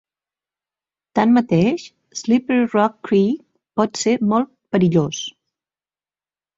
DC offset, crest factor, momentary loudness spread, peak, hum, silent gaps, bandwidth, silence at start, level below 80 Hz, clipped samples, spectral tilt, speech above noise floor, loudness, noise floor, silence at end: under 0.1%; 18 dB; 12 LU; -2 dBFS; 50 Hz at -40 dBFS; none; 7.8 kHz; 1.15 s; -58 dBFS; under 0.1%; -6 dB/octave; over 73 dB; -19 LUFS; under -90 dBFS; 1.25 s